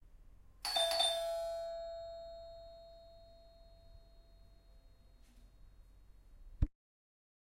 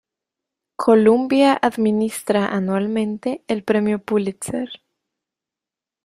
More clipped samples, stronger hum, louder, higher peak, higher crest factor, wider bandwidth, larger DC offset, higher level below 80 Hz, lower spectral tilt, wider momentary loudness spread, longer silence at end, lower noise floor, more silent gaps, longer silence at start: neither; neither; second, -37 LUFS vs -19 LUFS; second, -18 dBFS vs -2 dBFS; first, 24 dB vs 18 dB; about the same, 16 kHz vs 15.5 kHz; neither; first, -52 dBFS vs -62 dBFS; second, -2.5 dB/octave vs -5.5 dB/octave; first, 26 LU vs 12 LU; second, 0.8 s vs 1.3 s; second, -62 dBFS vs -88 dBFS; neither; second, 0.05 s vs 0.8 s